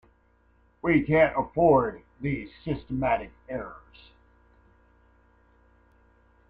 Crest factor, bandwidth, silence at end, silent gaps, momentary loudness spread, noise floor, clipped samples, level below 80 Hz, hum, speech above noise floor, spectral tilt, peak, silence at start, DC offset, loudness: 20 dB; 4.9 kHz; 2.75 s; none; 15 LU; -63 dBFS; under 0.1%; -50 dBFS; none; 38 dB; -10 dB/octave; -8 dBFS; 0.85 s; under 0.1%; -26 LUFS